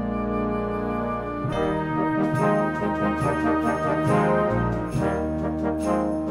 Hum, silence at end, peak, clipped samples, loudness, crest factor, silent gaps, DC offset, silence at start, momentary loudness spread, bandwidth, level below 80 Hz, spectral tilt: none; 0 s; -8 dBFS; under 0.1%; -24 LUFS; 14 dB; none; under 0.1%; 0 s; 5 LU; 13 kHz; -40 dBFS; -7.5 dB/octave